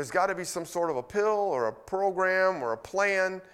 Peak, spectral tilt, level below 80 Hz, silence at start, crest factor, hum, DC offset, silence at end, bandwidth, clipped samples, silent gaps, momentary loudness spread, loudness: -12 dBFS; -4 dB/octave; -66 dBFS; 0 s; 16 dB; none; under 0.1%; 0.1 s; 15.5 kHz; under 0.1%; none; 6 LU; -28 LUFS